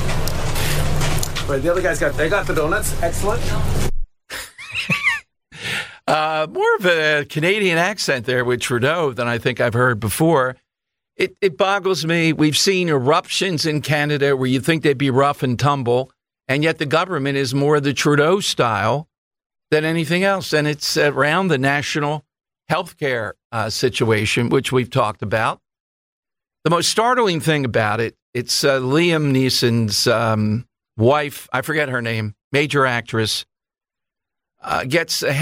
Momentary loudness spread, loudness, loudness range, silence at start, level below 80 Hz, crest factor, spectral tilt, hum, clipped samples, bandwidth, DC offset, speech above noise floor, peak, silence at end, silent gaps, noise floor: 8 LU; -19 LUFS; 4 LU; 0 s; -32 dBFS; 14 dB; -4.5 dB/octave; none; under 0.1%; 16 kHz; under 0.1%; 69 dB; -4 dBFS; 0 s; 19.18-19.31 s, 19.46-19.50 s, 23.45-23.50 s, 25.80-26.23 s, 28.22-28.33 s, 32.44-32.51 s; -87 dBFS